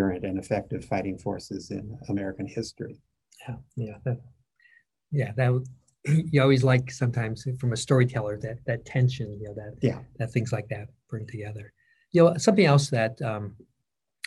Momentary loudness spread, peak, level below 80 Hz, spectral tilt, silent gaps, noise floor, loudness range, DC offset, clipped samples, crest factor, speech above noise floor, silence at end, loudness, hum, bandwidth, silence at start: 18 LU; -6 dBFS; -58 dBFS; -6.5 dB/octave; none; -83 dBFS; 10 LU; under 0.1%; under 0.1%; 20 dB; 57 dB; 0.7 s; -27 LUFS; none; 11.5 kHz; 0 s